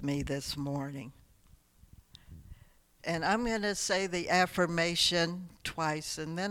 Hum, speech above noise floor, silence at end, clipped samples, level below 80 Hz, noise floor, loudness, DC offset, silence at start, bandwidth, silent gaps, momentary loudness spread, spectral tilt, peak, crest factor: none; 30 dB; 0 s; under 0.1%; -56 dBFS; -62 dBFS; -31 LUFS; under 0.1%; 0 s; 18 kHz; none; 13 LU; -3.5 dB/octave; -14 dBFS; 20 dB